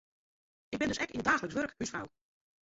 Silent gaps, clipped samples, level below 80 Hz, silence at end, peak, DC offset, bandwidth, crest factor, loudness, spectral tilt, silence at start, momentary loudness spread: none; under 0.1%; -62 dBFS; 0.55 s; -14 dBFS; under 0.1%; 7.6 kHz; 22 dB; -34 LUFS; -3 dB/octave; 0.7 s; 13 LU